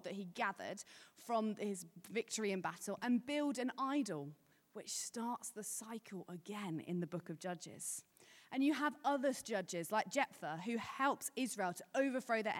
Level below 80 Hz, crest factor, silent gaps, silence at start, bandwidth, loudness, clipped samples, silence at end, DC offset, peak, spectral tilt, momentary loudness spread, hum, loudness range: under -90 dBFS; 18 dB; none; 0 s; 17 kHz; -41 LUFS; under 0.1%; 0 s; under 0.1%; -22 dBFS; -4 dB/octave; 11 LU; none; 6 LU